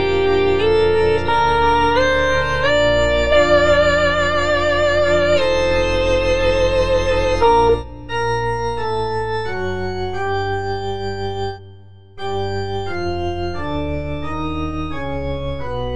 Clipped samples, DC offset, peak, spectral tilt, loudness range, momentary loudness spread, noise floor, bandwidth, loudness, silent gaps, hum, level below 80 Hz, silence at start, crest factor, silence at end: under 0.1%; 4%; -2 dBFS; -5.5 dB/octave; 9 LU; 10 LU; -42 dBFS; 10 kHz; -18 LUFS; none; none; -32 dBFS; 0 s; 14 dB; 0 s